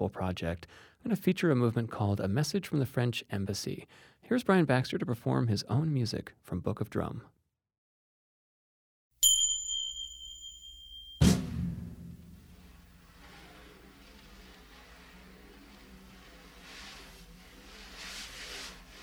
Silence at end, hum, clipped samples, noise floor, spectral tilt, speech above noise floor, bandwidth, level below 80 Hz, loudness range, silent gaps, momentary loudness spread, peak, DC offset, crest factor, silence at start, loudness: 0 s; none; under 0.1%; -56 dBFS; -4 dB/octave; 25 dB; over 20 kHz; -52 dBFS; 22 LU; 7.78-9.11 s; 26 LU; -12 dBFS; under 0.1%; 22 dB; 0 s; -31 LUFS